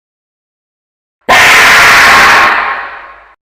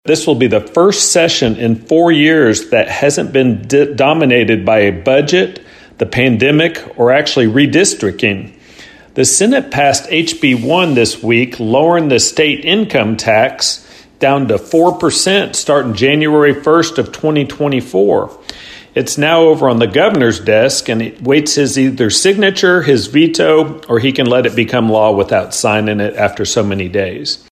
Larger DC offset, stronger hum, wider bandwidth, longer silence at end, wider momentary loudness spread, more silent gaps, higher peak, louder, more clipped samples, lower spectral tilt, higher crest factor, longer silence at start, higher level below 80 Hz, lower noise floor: neither; neither; first, over 20 kHz vs 14 kHz; first, 0.35 s vs 0.15 s; first, 18 LU vs 6 LU; neither; about the same, 0 dBFS vs 0 dBFS; first, -3 LUFS vs -11 LUFS; first, 3% vs under 0.1%; second, -0.5 dB/octave vs -4 dB/octave; about the same, 8 dB vs 12 dB; first, 1.3 s vs 0.05 s; first, -36 dBFS vs -46 dBFS; second, -29 dBFS vs -38 dBFS